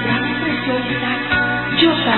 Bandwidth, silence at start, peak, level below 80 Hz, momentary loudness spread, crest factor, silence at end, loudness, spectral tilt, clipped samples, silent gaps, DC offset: 4.3 kHz; 0 s; -2 dBFS; -42 dBFS; 5 LU; 16 dB; 0 s; -17 LUFS; -10.5 dB/octave; under 0.1%; none; 0.4%